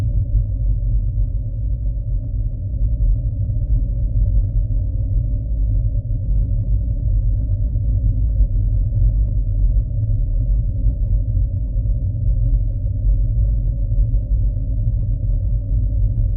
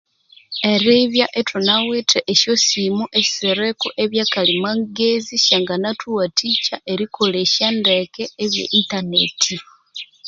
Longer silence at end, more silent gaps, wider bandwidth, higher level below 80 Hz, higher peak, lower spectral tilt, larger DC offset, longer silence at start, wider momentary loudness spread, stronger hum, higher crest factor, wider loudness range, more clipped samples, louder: about the same, 0 s vs 0 s; neither; second, 0.8 kHz vs 7.8 kHz; first, -18 dBFS vs -62 dBFS; second, -6 dBFS vs 0 dBFS; first, -15 dB/octave vs -2.5 dB/octave; neither; second, 0 s vs 0.5 s; second, 3 LU vs 8 LU; neither; second, 12 dB vs 18 dB; about the same, 2 LU vs 2 LU; neither; second, -21 LUFS vs -17 LUFS